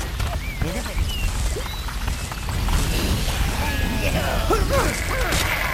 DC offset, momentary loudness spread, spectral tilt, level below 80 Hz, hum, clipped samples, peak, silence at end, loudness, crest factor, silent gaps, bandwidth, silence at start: under 0.1%; 7 LU; -4 dB/octave; -26 dBFS; none; under 0.1%; -6 dBFS; 0 s; -24 LUFS; 16 dB; none; 16.5 kHz; 0 s